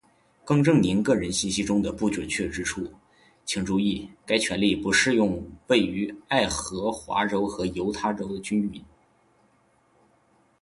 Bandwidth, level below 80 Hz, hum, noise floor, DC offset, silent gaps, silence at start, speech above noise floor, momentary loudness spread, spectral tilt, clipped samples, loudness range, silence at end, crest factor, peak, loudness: 11.5 kHz; -50 dBFS; none; -64 dBFS; under 0.1%; none; 0.45 s; 39 dB; 11 LU; -4.5 dB/octave; under 0.1%; 5 LU; 1.8 s; 20 dB; -6 dBFS; -25 LUFS